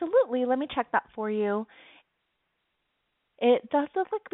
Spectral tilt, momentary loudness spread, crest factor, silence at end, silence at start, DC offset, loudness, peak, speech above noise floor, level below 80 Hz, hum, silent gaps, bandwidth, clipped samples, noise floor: -3.5 dB/octave; 7 LU; 18 dB; 0.05 s; 0 s; under 0.1%; -27 LUFS; -10 dBFS; 51 dB; -70 dBFS; none; none; 4 kHz; under 0.1%; -78 dBFS